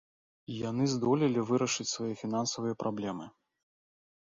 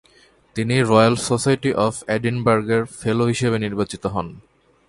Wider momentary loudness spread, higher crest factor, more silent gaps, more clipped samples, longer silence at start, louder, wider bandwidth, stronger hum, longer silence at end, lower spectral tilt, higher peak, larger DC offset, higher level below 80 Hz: about the same, 10 LU vs 11 LU; about the same, 18 dB vs 20 dB; neither; neither; about the same, 0.5 s vs 0.55 s; second, -32 LUFS vs -20 LUFS; second, 7.8 kHz vs 11.5 kHz; neither; first, 1 s vs 0.5 s; about the same, -5 dB/octave vs -5.5 dB/octave; second, -16 dBFS vs 0 dBFS; neither; second, -70 dBFS vs -50 dBFS